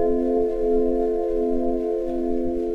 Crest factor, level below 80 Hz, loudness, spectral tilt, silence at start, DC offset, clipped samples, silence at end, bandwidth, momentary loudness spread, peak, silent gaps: 12 dB; -36 dBFS; -23 LUFS; -9 dB/octave; 0 s; under 0.1%; under 0.1%; 0 s; 5.4 kHz; 4 LU; -10 dBFS; none